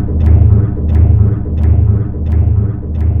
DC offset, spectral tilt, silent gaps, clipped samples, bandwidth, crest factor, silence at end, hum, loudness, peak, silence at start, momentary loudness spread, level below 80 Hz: 0.6%; -12.5 dB/octave; none; 0.5%; 2.5 kHz; 10 dB; 0 s; none; -12 LUFS; 0 dBFS; 0 s; 6 LU; -14 dBFS